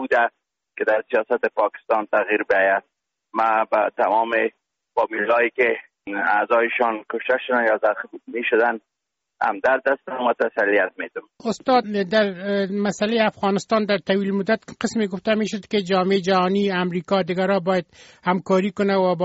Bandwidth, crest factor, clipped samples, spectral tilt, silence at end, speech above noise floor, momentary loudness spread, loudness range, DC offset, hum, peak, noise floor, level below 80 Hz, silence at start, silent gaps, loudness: 8 kHz; 16 dB; under 0.1%; -3.5 dB/octave; 0 s; 60 dB; 7 LU; 1 LU; under 0.1%; none; -6 dBFS; -80 dBFS; -64 dBFS; 0 s; none; -21 LUFS